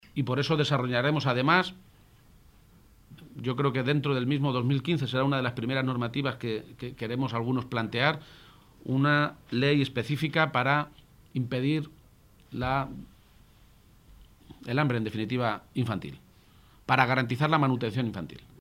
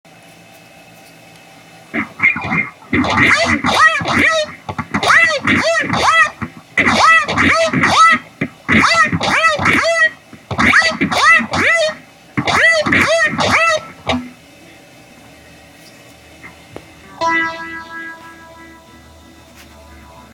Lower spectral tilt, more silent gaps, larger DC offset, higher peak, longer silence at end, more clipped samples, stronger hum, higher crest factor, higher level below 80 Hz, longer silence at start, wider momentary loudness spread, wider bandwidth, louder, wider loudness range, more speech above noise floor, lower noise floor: first, -7 dB/octave vs -3.5 dB/octave; neither; neither; second, -4 dBFS vs 0 dBFS; about the same, 0.2 s vs 0.15 s; neither; neither; first, 24 dB vs 16 dB; second, -58 dBFS vs -44 dBFS; second, 0.15 s vs 1.95 s; about the same, 13 LU vs 14 LU; about the same, 15 kHz vs 16.5 kHz; second, -28 LUFS vs -12 LUFS; second, 6 LU vs 12 LU; about the same, 30 dB vs 28 dB; first, -58 dBFS vs -42 dBFS